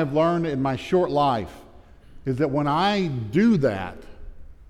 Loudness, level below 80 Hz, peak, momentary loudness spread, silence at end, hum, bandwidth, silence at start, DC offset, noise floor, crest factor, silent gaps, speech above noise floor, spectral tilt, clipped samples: -23 LUFS; -46 dBFS; -10 dBFS; 11 LU; 0.05 s; none; 12 kHz; 0 s; under 0.1%; -47 dBFS; 14 dB; none; 25 dB; -7.5 dB/octave; under 0.1%